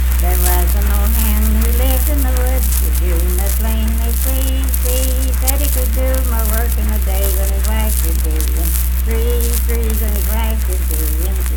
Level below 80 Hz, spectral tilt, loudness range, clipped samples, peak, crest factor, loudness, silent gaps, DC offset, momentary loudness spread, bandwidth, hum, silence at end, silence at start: -14 dBFS; -5 dB/octave; 2 LU; under 0.1%; 0 dBFS; 14 dB; -16 LUFS; none; under 0.1%; 3 LU; 19.5 kHz; none; 0 s; 0 s